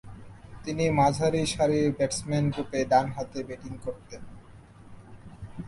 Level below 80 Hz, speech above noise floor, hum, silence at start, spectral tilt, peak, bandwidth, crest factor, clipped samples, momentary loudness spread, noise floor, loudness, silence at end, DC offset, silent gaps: -52 dBFS; 23 dB; none; 0.05 s; -5.5 dB/octave; -8 dBFS; 11.5 kHz; 20 dB; under 0.1%; 23 LU; -50 dBFS; -27 LUFS; 0 s; under 0.1%; none